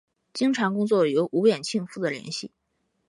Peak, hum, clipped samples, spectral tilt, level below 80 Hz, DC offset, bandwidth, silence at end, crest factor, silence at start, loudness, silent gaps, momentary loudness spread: -8 dBFS; none; under 0.1%; -5 dB/octave; -76 dBFS; under 0.1%; 11.5 kHz; 0.6 s; 18 dB; 0.35 s; -25 LUFS; none; 12 LU